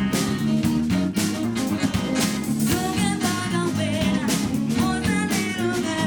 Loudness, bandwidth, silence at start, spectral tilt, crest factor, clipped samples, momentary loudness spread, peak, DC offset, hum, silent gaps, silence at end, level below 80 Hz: -23 LUFS; over 20 kHz; 0 s; -4.5 dB/octave; 14 dB; under 0.1%; 2 LU; -8 dBFS; 0.1%; none; none; 0 s; -44 dBFS